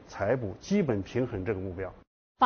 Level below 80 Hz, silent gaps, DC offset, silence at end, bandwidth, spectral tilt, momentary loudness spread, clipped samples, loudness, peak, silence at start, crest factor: -54 dBFS; 2.07-2.35 s; under 0.1%; 0 s; 6.8 kHz; -6 dB/octave; 10 LU; under 0.1%; -31 LUFS; -10 dBFS; 0 s; 20 dB